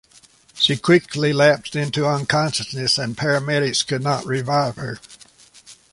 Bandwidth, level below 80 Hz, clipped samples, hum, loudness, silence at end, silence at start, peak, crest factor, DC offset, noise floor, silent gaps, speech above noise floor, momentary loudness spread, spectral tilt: 11.5 kHz; -56 dBFS; under 0.1%; none; -19 LUFS; 0.2 s; 0.55 s; -2 dBFS; 18 dB; under 0.1%; -52 dBFS; none; 32 dB; 7 LU; -4.5 dB/octave